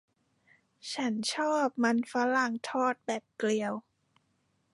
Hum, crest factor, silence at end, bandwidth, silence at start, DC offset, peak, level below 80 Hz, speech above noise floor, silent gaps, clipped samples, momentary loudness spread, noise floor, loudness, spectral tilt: none; 16 dB; 0.95 s; 11.5 kHz; 0.85 s; under 0.1%; -16 dBFS; -82 dBFS; 44 dB; none; under 0.1%; 9 LU; -74 dBFS; -31 LUFS; -3.5 dB/octave